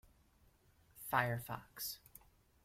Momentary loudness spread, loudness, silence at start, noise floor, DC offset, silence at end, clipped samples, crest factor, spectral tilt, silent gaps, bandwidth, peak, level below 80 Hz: 16 LU; -40 LUFS; 0.95 s; -71 dBFS; under 0.1%; 0.45 s; under 0.1%; 26 dB; -4 dB/octave; none; 16.5 kHz; -18 dBFS; -70 dBFS